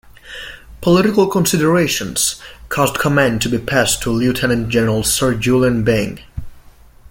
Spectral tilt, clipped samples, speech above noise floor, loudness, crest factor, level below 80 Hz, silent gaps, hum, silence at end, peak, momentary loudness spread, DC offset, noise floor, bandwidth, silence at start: -4.5 dB/octave; under 0.1%; 27 dB; -15 LUFS; 16 dB; -38 dBFS; none; none; 0.5 s; -2 dBFS; 17 LU; under 0.1%; -42 dBFS; 17 kHz; 0.25 s